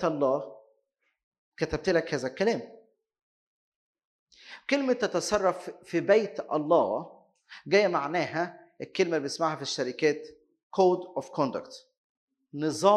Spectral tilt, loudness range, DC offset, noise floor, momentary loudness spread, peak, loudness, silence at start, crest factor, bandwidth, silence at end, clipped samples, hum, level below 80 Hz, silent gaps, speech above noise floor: -4.5 dB/octave; 5 LU; under 0.1%; -76 dBFS; 16 LU; -8 dBFS; -28 LUFS; 0 s; 22 dB; 12.5 kHz; 0 s; under 0.1%; none; -62 dBFS; 1.23-1.32 s, 1.38-1.52 s, 3.22-3.95 s, 4.05-4.27 s, 10.63-10.70 s, 11.97-12.28 s; 49 dB